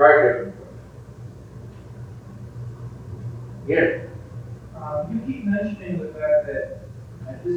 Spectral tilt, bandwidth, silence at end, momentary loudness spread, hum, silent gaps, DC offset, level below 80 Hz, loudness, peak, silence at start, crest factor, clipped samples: -8.5 dB/octave; 8.4 kHz; 0 s; 20 LU; none; none; under 0.1%; -50 dBFS; -24 LUFS; 0 dBFS; 0 s; 24 dB; under 0.1%